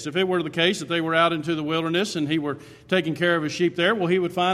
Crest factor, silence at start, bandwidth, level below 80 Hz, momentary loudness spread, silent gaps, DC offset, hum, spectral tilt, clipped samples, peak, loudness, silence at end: 18 dB; 0 s; 13.5 kHz; -64 dBFS; 5 LU; none; under 0.1%; none; -5 dB/octave; under 0.1%; -6 dBFS; -23 LUFS; 0 s